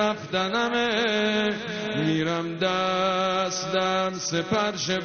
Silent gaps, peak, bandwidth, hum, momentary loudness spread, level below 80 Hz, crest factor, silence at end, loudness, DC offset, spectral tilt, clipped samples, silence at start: none; -12 dBFS; 6.8 kHz; none; 4 LU; -60 dBFS; 14 dB; 0 s; -25 LUFS; under 0.1%; -3 dB/octave; under 0.1%; 0 s